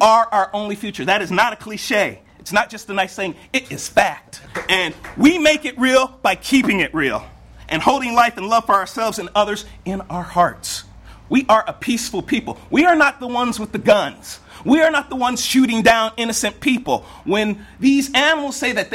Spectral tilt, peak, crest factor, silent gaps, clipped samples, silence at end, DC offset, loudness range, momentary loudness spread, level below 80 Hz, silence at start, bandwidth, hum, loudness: -3.5 dB/octave; 0 dBFS; 18 dB; none; under 0.1%; 0 s; under 0.1%; 3 LU; 11 LU; -46 dBFS; 0 s; 16.5 kHz; none; -18 LUFS